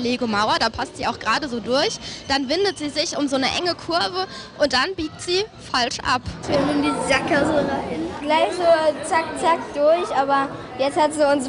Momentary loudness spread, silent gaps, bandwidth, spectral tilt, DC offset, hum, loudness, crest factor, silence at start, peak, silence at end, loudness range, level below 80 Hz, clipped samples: 6 LU; none; 11 kHz; -3.5 dB/octave; under 0.1%; none; -21 LUFS; 16 dB; 0 s; -4 dBFS; 0 s; 2 LU; -48 dBFS; under 0.1%